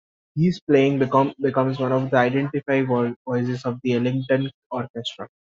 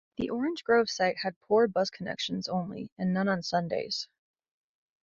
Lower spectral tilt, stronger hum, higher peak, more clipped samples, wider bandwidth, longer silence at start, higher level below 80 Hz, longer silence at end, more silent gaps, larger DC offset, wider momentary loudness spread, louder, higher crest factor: about the same, -6 dB/octave vs -5 dB/octave; neither; first, -4 dBFS vs -12 dBFS; neither; about the same, 7.6 kHz vs 7.6 kHz; first, 0.35 s vs 0.2 s; about the same, -62 dBFS vs -66 dBFS; second, 0.25 s vs 1 s; first, 0.61-0.67 s, 3.16-3.25 s, 4.54-4.70 s, 4.90-4.94 s vs 1.36-1.41 s, 2.92-2.96 s; neither; about the same, 11 LU vs 9 LU; first, -22 LUFS vs -30 LUFS; about the same, 18 dB vs 18 dB